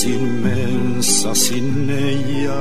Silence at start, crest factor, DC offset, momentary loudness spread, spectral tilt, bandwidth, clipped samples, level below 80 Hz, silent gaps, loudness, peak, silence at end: 0 s; 16 dB; 10%; 6 LU; -4 dB/octave; 15.5 kHz; under 0.1%; -52 dBFS; none; -18 LUFS; -2 dBFS; 0 s